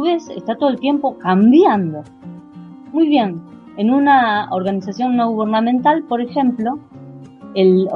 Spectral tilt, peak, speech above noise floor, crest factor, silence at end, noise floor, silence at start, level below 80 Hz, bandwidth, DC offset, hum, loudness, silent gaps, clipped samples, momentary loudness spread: -7.5 dB/octave; -2 dBFS; 22 dB; 14 dB; 0 s; -37 dBFS; 0 s; -60 dBFS; 6.6 kHz; under 0.1%; none; -16 LUFS; none; under 0.1%; 18 LU